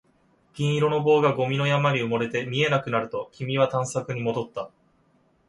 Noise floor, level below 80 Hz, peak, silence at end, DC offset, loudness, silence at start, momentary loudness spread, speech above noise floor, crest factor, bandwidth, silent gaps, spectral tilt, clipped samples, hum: -64 dBFS; -64 dBFS; -8 dBFS; 0.8 s; under 0.1%; -24 LUFS; 0.55 s; 11 LU; 40 dB; 18 dB; 11.5 kHz; none; -6 dB/octave; under 0.1%; none